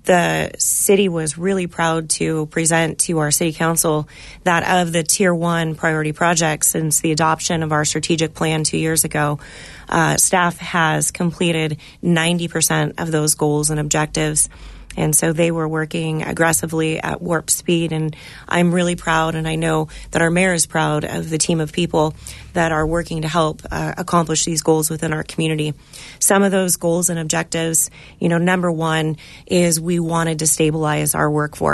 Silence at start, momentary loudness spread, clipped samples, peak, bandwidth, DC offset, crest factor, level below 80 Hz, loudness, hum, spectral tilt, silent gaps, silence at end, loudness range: 0.05 s; 7 LU; under 0.1%; -2 dBFS; 12.5 kHz; under 0.1%; 18 dB; -42 dBFS; -18 LUFS; none; -4 dB/octave; none; 0 s; 2 LU